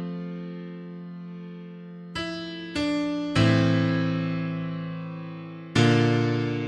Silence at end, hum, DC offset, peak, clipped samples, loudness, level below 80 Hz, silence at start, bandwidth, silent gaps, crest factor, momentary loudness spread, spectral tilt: 0 s; none; under 0.1%; -6 dBFS; under 0.1%; -26 LUFS; -54 dBFS; 0 s; 10 kHz; none; 20 dB; 18 LU; -6.5 dB/octave